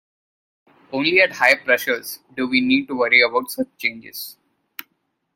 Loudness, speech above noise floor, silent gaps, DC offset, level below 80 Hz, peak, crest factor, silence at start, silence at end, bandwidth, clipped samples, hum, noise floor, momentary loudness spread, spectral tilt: -18 LUFS; 52 dB; none; under 0.1%; -64 dBFS; 0 dBFS; 20 dB; 0.9 s; 1.05 s; 17 kHz; under 0.1%; none; -71 dBFS; 21 LU; -3 dB/octave